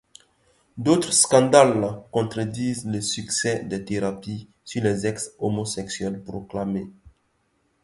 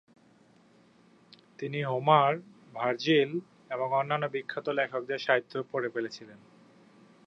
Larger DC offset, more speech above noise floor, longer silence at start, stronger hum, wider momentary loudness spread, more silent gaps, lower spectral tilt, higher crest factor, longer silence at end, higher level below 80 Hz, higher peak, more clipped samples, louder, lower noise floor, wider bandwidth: neither; first, 46 dB vs 32 dB; second, 0.75 s vs 1.6 s; neither; about the same, 16 LU vs 15 LU; neither; second, -4 dB/octave vs -6 dB/octave; about the same, 24 dB vs 24 dB; second, 0.75 s vs 0.9 s; first, -56 dBFS vs -82 dBFS; first, 0 dBFS vs -8 dBFS; neither; first, -23 LUFS vs -29 LUFS; first, -69 dBFS vs -61 dBFS; first, 11.5 kHz vs 7.8 kHz